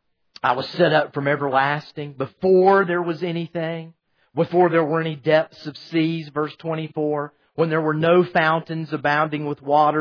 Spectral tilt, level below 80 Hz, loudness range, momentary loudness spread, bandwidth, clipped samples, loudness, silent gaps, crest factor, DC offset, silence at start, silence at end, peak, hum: -8 dB/octave; -68 dBFS; 2 LU; 11 LU; 5.4 kHz; under 0.1%; -21 LUFS; none; 16 dB; under 0.1%; 0.45 s; 0 s; -4 dBFS; none